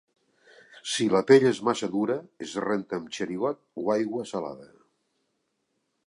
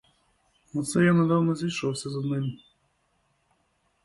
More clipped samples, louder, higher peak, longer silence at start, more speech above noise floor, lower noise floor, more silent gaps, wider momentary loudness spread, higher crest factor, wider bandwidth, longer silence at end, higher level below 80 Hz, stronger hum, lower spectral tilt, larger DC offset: neither; about the same, -26 LUFS vs -26 LUFS; first, -6 dBFS vs -10 dBFS; about the same, 0.75 s vs 0.75 s; first, 51 dB vs 46 dB; first, -77 dBFS vs -71 dBFS; neither; about the same, 15 LU vs 14 LU; about the same, 22 dB vs 18 dB; about the same, 11.5 kHz vs 11.5 kHz; about the same, 1.4 s vs 1.5 s; second, -72 dBFS vs -64 dBFS; neither; about the same, -5 dB/octave vs -6 dB/octave; neither